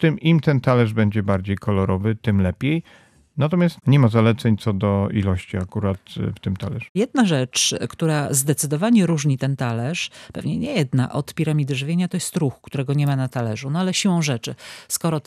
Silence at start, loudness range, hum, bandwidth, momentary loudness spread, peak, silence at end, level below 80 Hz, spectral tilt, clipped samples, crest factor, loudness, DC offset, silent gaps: 0 s; 3 LU; none; 14.5 kHz; 9 LU; -4 dBFS; 0.05 s; -56 dBFS; -5.5 dB/octave; under 0.1%; 16 dB; -21 LUFS; under 0.1%; 6.89-6.95 s